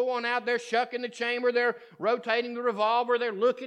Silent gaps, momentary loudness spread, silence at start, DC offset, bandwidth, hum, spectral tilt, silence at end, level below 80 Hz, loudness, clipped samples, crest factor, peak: none; 5 LU; 0 s; under 0.1%; 9.4 kHz; none; -3.5 dB/octave; 0 s; under -90 dBFS; -28 LUFS; under 0.1%; 16 dB; -12 dBFS